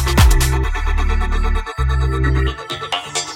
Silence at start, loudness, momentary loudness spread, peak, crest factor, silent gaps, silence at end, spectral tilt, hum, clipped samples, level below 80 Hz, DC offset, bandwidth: 0 s; -18 LUFS; 8 LU; 0 dBFS; 16 dB; none; 0 s; -4.5 dB/octave; none; under 0.1%; -18 dBFS; under 0.1%; 16.5 kHz